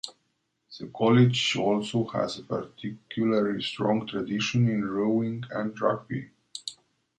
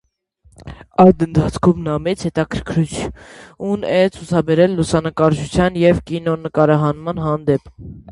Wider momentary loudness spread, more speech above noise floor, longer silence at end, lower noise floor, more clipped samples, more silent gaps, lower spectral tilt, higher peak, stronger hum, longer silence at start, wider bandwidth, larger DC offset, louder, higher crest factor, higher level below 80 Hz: first, 16 LU vs 10 LU; first, 49 dB vs 39 dB; first, 0.45 s vs 0 s; first, -75 dBFS vs -55 dBFS; neither; neither; about the same, -6 dB/octave vs -7 dB/octave; second, -8 dBFS vs 0 dBFS; neither; second, 0.05 s vs 0.65 s; about the same, 11.5 kHz vs 11.5 kHz; neither; second, -27 LUFS vs -17 LUFS; about the same, 18 dB vs 16 dB; second, -66 dBFS vs -38 dBFS